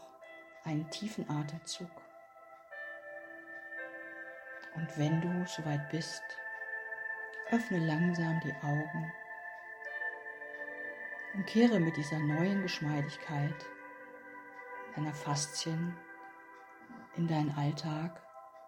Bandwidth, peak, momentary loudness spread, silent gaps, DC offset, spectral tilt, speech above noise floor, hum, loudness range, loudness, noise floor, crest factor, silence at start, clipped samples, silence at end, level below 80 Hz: 16.5 kHz; -14 dBFS; 18 LU; none; under 0.1%; -5.5 dB/octave; 22 dB; none; 9 LU; -36 LUFS; -56 dBFS; 22 dB; 0 s; under 0.1%; 0 s; -76 dBFS